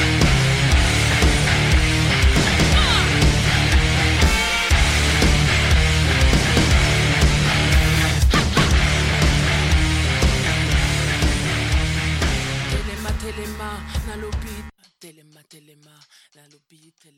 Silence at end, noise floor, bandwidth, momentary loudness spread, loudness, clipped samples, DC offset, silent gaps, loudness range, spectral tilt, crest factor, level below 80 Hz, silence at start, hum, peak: 2.1 s; -56 dBFS; 16 kHz; 11 LU; -17 LUFS; under 0.1%; under 0.1%; none; 13 LU; -4 dB/octave; 14 dB; -22 dBFS; 0 s; none; -4 dBFS